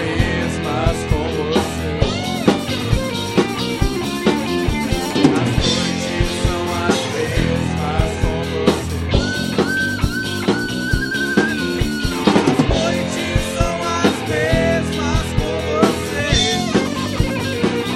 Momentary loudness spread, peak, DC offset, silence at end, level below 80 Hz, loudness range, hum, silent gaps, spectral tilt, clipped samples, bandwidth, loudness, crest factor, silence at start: 4 LU; 0 dBFS; under 0.1%; 0 s; -28 dBFS; 2 LU; none; none; -5 dB/octave; under 0.1%; 16 kHz; -18 LUFS; 18 dB; 0 s